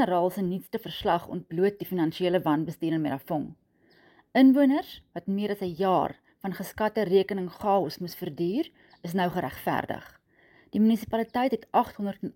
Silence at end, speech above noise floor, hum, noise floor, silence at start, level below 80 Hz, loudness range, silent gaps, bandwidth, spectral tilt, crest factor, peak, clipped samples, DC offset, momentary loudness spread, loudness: 0.05 s; 35 dB; none; -61 dBFS; 0 s; -60 dBFS; 4 LU; none; 17 kHz; -7 dB/octave; 18 dB; -10 dBFS; under 0.1%; under 0.1%; 11 LU; -27 LUFS